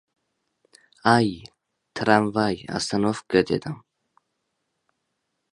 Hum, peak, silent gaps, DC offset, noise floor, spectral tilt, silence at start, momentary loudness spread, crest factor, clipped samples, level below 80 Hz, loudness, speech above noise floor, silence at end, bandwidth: none; -2 dBFS; none; under 0.1%; -77 dBFS; -5.5 dB/octave; 1.05 s; 17 LU; 24 dB; under 0.1%; -58 dBFS; -23 LUFS; 55 dB; 1.75 s; 11.5 kHz